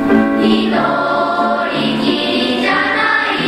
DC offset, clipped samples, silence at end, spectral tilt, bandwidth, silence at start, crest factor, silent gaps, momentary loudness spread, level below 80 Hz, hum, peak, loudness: under 0.1%; under 0.1%; 0 s; -5.5 dB/octave; 12.5 kHz; 0 s; 14 dB; none; 3 LU; -46 dBFS; none; 0 dBFS; -14 LUFS